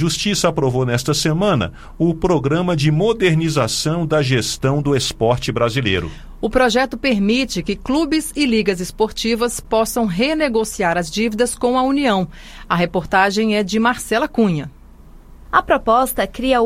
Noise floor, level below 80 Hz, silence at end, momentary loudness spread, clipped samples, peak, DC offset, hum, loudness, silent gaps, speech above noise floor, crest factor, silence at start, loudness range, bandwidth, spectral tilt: -41 dBFS; -38 dBFS; 0 s; 5 LU; under 0.1%; 0 dBFS; under 0.1%; none; -18 LUFS; none; 24 dB; 18 dB; 0 s; 1 LU; 16 kHz; -5 dB/octave